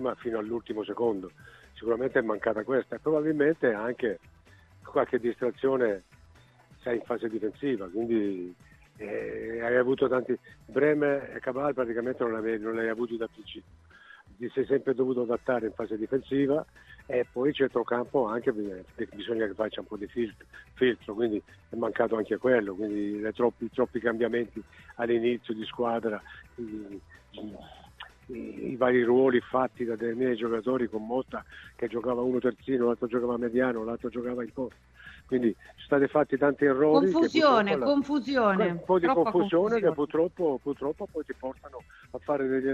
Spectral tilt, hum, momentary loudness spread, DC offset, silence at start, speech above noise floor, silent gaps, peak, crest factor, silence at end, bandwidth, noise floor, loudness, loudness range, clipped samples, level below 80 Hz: -7 dB/octave; none; 15 LU; under 0.1%; 0 s; 29 dB; none; -8 dBFS; 22 dB; 0 s; 8 kHz; -57 dBFS; -28 LUFS; 7 LU; under 0.1%; -60 dBFS